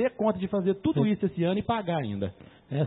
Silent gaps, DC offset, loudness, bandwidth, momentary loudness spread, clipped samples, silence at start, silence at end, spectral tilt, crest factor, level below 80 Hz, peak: none; under 0.1%; -28 LUFS; 4.1 kHz; 8 LU; under 0.1%; 0 s; 0 s; -11.5 dB/octave; 16 dB; -58 dBFS; -12 dBFS